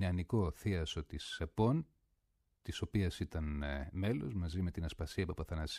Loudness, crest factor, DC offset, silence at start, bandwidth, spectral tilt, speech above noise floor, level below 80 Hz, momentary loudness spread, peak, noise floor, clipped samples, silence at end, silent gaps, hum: -39 LUFS; 18 dB; under 0.1%; 0 s; 14 kHz; -6.5 dB/octave; 43 dB; -48 dBFS; 8 LU; -20 dBFS; -80 dBFS; under 0.1%; 0 s; none; none